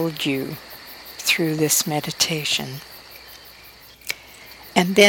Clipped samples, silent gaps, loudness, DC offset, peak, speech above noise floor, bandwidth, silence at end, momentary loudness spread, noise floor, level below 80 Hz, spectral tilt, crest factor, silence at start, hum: under 0.1%; none; -22 LUFS; under 0.1%; 0 dBFS; 25 dB; 19 kHz; 0 s; 22 LU; -46 dBFS; -58 dBFS; -3 dB/octave; 22 dB; 0 s; none